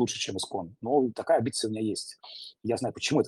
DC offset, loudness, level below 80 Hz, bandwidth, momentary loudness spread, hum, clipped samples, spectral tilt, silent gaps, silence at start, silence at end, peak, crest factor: under 0.1%; -29 LUFS; -70 dBFS; 12.5 kHz; 12 LU; none; under 0.1%; -4.5 dB/octave; none; 0 s; 0 s; -12 dBFS; 18 dB